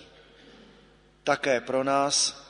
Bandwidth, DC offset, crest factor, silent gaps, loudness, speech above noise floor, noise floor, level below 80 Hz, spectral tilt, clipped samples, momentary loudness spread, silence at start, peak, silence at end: 10.5 kHz; under 0.1%; 22 dB; none; -25 LUFS; 32 dB; -57 dBFS; -64 dBFS; -2 dB/octave; under 0.1%; 6 LU; 1.25 s; -8 dBFS; 0.1 s